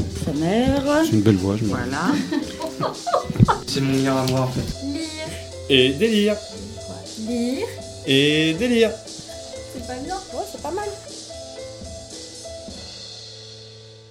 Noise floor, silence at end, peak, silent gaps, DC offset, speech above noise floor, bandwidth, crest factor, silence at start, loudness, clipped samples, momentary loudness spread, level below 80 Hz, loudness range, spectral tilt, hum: -42 dBFS; 0 s; 0 dBFS; none; under 0.1%; 23 dB; 17 kHz; 22 dB; 0 s; -21 LUFS; under 0.1%; 17 LU; -42 dBFS; 11 LU; -5 dB/octave; none